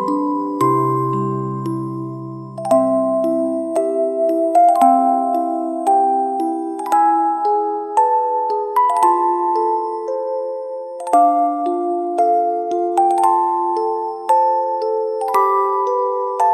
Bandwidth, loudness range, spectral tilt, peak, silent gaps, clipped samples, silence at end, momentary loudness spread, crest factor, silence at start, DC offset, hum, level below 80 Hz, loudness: 13.5 kHz; 3 LU; -7.5 dB/octave; -2 dBFS; none; under 0.1%; 0 s; 9 LU; 14 dB; 0 s; under 0.1%; none; -68 dBFS; -17 LUFS